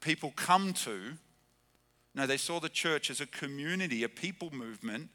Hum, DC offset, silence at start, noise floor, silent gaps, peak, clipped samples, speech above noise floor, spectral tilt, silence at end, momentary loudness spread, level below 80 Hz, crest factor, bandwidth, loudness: none; under 0.1%; 0 s; -71 dBFS; none; -12 dBFS; under 0.1%; 36 dB; -3 dB/octave; 0.05 s; 14 LU; -78 dBFS; 24 dB; 20 kHz; -34 LUFS